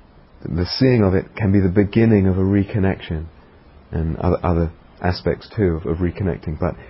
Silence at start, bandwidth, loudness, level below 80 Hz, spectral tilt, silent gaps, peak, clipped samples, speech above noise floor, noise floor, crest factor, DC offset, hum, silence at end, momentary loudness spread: 0.4 s; 5.8 kHz; -19 LUFS; -32 dBFS; -11.5 dB/octave; none; -2 dBFS; under 0.1%; 28 dB; -46 dBFS; 18 dB; under 0.1%; none; 0 s; 11 LU